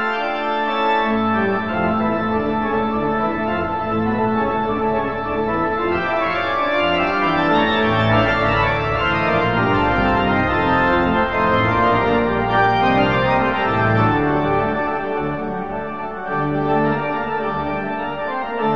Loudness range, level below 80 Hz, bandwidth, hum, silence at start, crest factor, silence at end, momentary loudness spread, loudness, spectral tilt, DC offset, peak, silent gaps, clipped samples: 4 LU; -38 dBFS; 7.4 kHz; none; 0 s; 14 dB; 0 s; 7 LU; -18 LUFS; -7.5 dB/octave; 1%; -4 dBFS; none; under 0.1%